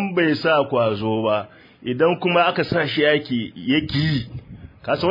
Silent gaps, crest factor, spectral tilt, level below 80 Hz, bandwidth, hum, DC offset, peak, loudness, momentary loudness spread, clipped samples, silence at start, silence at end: none; 16 dB; -8 dB/octave; -50 dBFS; 5.4 kHz; none; under 0.1%; -4 dBFS; -20 LUFS; 13 LU; under 0.1%; 0 s; 0 s